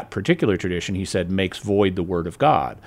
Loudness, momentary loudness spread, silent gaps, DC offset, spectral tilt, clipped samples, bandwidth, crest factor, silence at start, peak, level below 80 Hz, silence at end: -22 LUFS; 6 LU; none; under 0.1%; -6 dB/octave; under 0.1%; 15 kHz; 18 dB; 0 s; -4 dBFS; -48 dBFS; 0 s